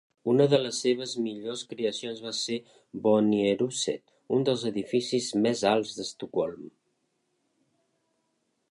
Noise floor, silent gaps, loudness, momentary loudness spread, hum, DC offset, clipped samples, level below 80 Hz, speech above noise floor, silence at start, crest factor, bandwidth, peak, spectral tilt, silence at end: -76 dBFS; none; -28 LUFS; 12 LU; none; under 0.1%; under 0.1%; -72 dBFS; 48 dB; 0.25 s; 20 dB; 11.5 kHz; -8 dBFS; -4.5 dB/octave; 2 s